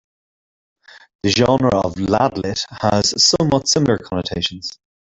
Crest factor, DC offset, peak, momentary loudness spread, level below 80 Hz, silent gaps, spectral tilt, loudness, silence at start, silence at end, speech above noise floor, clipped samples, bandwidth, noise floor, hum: 16 dB; under 0.1%; -2 dBFS; 10 LU; -46 dBFS; 1.15-1.19 s; -4 dB/octave; -17 LUFS; 0.95 s; 0.35 s; over 73 dB; under 0.1%; 8.4 kHz; under -90 dBFS; none